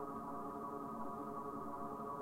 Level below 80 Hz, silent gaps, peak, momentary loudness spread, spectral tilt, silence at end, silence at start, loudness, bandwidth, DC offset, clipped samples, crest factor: -70 dBFS; none; -34 dBFS; 0 LU; -7.5 dB/octave; 0 s; 0 s; -46 LUFS; 16 kHz; under 0.1%; under 0.1%; 12 dB